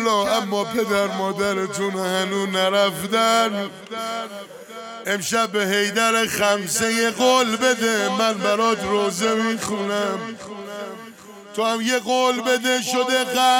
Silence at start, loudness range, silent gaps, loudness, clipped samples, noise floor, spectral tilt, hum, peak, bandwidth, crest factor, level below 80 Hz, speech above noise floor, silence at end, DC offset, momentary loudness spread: 0 s; 4 LU; none; -20 LUFS; under 0.1%; -41 dBFS; -3 dB/octave; none; -4 dBFS; 17 kHz; 18 dB; -62 dBFS; 20 dB; 0 s; under 0.1%; 15 LU